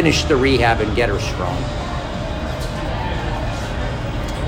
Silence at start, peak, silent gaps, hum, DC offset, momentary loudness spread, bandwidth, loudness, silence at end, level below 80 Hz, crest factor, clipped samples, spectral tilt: 0 s; -2 dBFS; none; none; under 0.1%; 10 LU; 16.5 kHz; -20 LUFS; 0 s; -26 dBFS; 18 dB; under 0.1%; -5.5 dB/octave